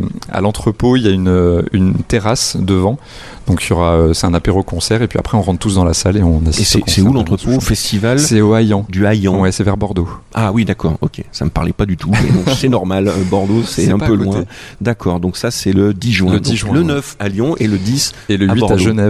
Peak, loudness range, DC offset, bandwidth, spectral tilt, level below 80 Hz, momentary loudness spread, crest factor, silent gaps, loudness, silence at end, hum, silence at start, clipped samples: 0 dBFS; 3 LU; under 0.1%; 14 kHz; -5.5 dB/octave; -28 dBFS; 6 LU; 12 dB; none; -14 LUFS; 0 s; none; 0 s; under 0.1%